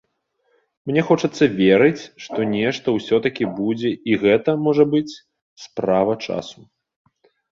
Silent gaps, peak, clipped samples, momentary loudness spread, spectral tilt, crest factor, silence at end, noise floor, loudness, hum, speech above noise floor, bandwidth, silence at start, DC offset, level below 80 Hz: 5.42-5.56 s; -2 dBFS; under 0.1%; 13 LU; -6.5 dB/octave; 18 dB; 1.05 s; -69 dBFS; -19 LUFS; none; 50 dB; 7.6 kHz; 0.85 s; under 0.1%; -58 dBFS